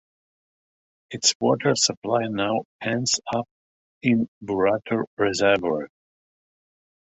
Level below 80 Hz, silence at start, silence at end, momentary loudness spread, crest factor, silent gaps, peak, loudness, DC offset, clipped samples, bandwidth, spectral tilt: -60 dBFS; 1.1 s; 1.15 s; 9 LU; 20 dB; 1.35-1.40 s, 1.97-2.02 s, 2.65-2.79 s, 3.51-4.01 s, 4.28-4.41 s, 5.07-5.17 s; -4 dBFS; -23 LUFS; under 0.1%; under 0.1%; 8.4 kHz; -3.5 dB/octave